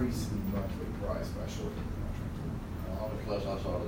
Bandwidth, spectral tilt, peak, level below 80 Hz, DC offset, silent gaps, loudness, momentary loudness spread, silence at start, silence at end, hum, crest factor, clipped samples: 16 kHz; -7 dB/octave; -20 dBFS; -42 dBFS; under 0.1%; none; -37 LUFS; 4 LU; 0 s; 0 s; none; 16 dB; under 0.1%